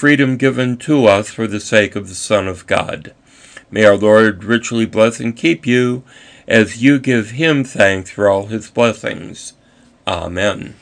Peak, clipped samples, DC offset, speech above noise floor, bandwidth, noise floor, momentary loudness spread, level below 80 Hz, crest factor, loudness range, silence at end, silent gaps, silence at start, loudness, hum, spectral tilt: 0 dBFS; under 0.1%; under 0.1%; 35 dB; 10 kHz; -49 dBFS; 13 LU; -50 dBFS; 14 dB; 3 LU; 0.1 s; none; 0 s; -14 LUFS; none; -5 dB/octave